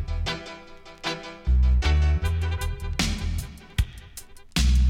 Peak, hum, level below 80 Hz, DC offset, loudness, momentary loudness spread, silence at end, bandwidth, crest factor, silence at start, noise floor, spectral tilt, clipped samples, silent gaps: -8 dBFS; none; -26 dBFS; under 0.1%; -27 LUFS; 20 LU; 0 s; 14.5 kHz; 16 dB; 0 s; -44 dBFS; -5 dB/octave; under 0.1%; none